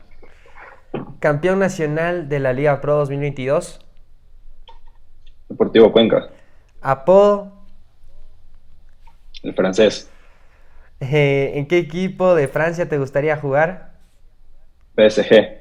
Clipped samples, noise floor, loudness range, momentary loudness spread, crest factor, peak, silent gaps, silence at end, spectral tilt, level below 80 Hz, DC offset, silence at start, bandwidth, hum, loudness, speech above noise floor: under 0.1%; -45 dBFS; 6 LU; 15 LU; 18 dB; 0 dBFS; none; 0 s; -6.5 dB/octave; -42 dBFS; under 0.1%; 0.1 s; 11 kHz; none; -17 LUFS; 29 dB